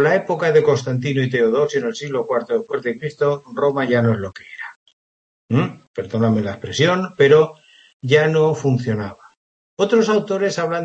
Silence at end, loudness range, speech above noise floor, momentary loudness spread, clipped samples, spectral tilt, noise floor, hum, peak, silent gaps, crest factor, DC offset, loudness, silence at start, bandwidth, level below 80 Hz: 0 s; 4 LU; over 72 dB; 11 LU; under 0.1%; -6 dB/octave; under -90 dBFS; none; -2 dBFS; 4.76-4.86 s, 4.93-5.48 s, 5.87-5.94 s, 7.94-8.00 s, 9.37-9.77 s; 18 dB; under 0.1%; -18 LUFS; 0 s; 8.2 kHz; -60 dBFS